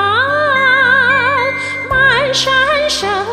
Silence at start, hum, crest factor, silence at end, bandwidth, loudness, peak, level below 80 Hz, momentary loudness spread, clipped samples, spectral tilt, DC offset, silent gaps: 0 s; none; 12 dB; 0 s; 15 kHz; -11 LUFS; 0 dBFS; -40 dBFS; 6 LU; under 0.1%; -2.5 dB/octave; under 0.1%; none